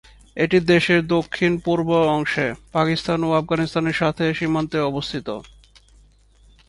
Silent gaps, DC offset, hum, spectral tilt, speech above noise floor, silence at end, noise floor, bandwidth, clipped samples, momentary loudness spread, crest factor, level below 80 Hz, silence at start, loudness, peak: none; under 0.1%; none; -6.5 dB/octave; 33 dB; 1.25 s; -53 dBFS; 11.5 kHz; under 0.1%; 10 LU; 18 dB; -48 dBFS; 0.35 s; -20 LUFS; -4 dBFS